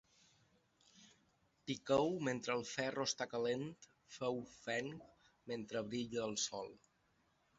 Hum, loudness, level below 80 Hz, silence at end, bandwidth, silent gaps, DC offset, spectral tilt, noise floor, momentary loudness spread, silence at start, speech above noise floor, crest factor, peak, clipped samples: none; -41 LUFS; -76 dBFS; 0.85 s; 8 kHz; none; under 0.1%; -3.5 dB/octave; -78 dBFS; 16 LU; 0.95 s; 37 dB; 22 dB; -20 dBFS; under 0.1%